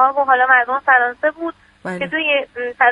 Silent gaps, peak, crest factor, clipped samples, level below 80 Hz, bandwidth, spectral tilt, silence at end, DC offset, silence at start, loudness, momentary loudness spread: none; 0 dBFS; 16 dB; under 0.1%; -60 dBFS; 10.5 kHz; -5 dB/octave; 0 s; under 0.1%; 0 s; -15 LUFS; 16 LU